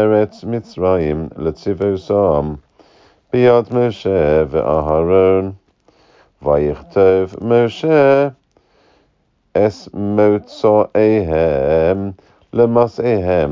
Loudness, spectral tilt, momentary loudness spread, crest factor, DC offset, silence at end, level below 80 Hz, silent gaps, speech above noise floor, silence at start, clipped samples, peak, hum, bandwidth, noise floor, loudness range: -15 LUFS; -8.5 dB/octave; 10 LU; 14 dB; under 0.1%; 0 s; -36 dBFS; none; 47 dB; 0 s; under 0.1%; -2 dBFS; none; 7.2 kHz; -61 dBFS; 2 LU